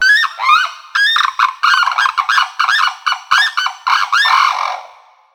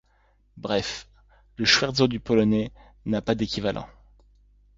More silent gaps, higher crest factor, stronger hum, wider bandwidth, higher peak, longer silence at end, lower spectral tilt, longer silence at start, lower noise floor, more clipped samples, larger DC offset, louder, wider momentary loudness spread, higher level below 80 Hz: neither; second, 14 dB vs 22 dB; second, none vs 50 Hz at -50 dBFS; first, over 20 kHz vs 7.8 kHz; first, 0 dBFS vs -6 dBFS; second, 0.5 s vs 0.9 s; second, 4 dB/octave vs -4.5 dB/octave; second, 0 s vs 0.55 s; second, -42 dBFS vs -63 dBFS; neither; neither; first, -13 LUFS vs -24 LUFS; second, 6 LU vs 18 LU; second, -66 dBFS vs -50 dBFS